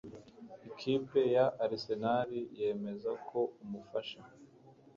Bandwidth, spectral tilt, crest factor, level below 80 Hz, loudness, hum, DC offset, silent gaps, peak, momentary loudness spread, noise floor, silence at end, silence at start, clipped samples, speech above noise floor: 7.2 kHz; -7 dB/octave; 18 dB; -74 dBFS; -35 LUFS; none; under 0.1%; none; -18 dBFS; 21 LU; -60 dBFS; 0.25 s; 0.05 s; under 0.1%; 26 dB